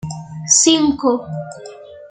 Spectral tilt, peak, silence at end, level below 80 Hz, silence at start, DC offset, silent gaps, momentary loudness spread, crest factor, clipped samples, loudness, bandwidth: -3 dB/octave; 0 dBFS; 0.05 s; -54 dBFS; 0.05 s; under 0.1%; none; 20 LU; 18 dB; under 0.1%; -14 LUFS; 9.6 kHz